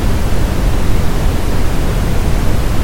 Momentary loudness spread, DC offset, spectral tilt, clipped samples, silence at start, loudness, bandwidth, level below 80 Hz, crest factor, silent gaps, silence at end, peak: 1 LU; under 0.1%; -6 dB/octave; under 0.1%; 0 s; -17 LUFS; 17 kHz; -14 dBFS; 10 dB; none; 0 s; 0 dBFS